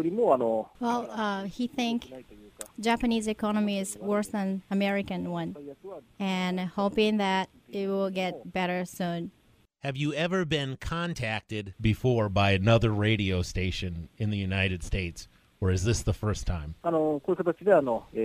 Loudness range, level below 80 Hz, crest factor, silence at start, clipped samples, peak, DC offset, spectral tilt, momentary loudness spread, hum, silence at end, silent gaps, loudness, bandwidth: 4 LU; -46 dBFS; 20 dB; 0 s; under 0.1%; -8 dBFS; under 0.1%; -6 dB/octave; 12 LU; none; 0 s; none; -29 LUFS; 15.5 kHz